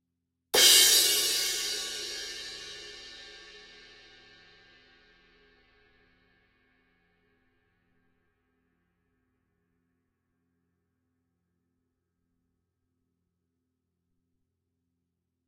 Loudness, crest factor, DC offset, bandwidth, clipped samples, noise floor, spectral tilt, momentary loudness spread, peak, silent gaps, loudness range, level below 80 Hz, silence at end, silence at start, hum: -22 LUFS; 28 dB; under 0.1%; 16 kHz; under 0.1%; -83 dBFS; 2 dB/octave; 28 LU; -4 dBFS; none; 25 LU; -68 dBFS; 11.9 s; 0.55 s; none